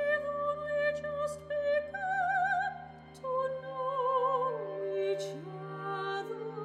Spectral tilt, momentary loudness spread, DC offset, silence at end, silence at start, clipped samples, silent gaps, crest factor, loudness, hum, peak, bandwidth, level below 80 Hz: -5 dB/octave; 11 LU; under 0.1%; 0 s; 0 s; under 0.1%; none; 14 dB; -33 LUFS; none; -18 dBFS; 12 kHz; -66 dBFS